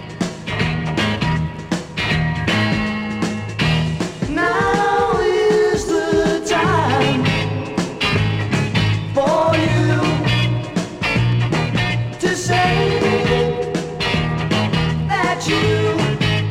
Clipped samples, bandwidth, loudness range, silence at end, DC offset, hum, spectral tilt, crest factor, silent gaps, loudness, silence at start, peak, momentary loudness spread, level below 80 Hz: under 0.1%; 14 kHz; 3 LU; 0 s; under 0.1%; none; -5.5 dB/octave; 14 dB; none; -18 LUFS; 0 s; -4 dBFS; 6 LU; -38 dBFS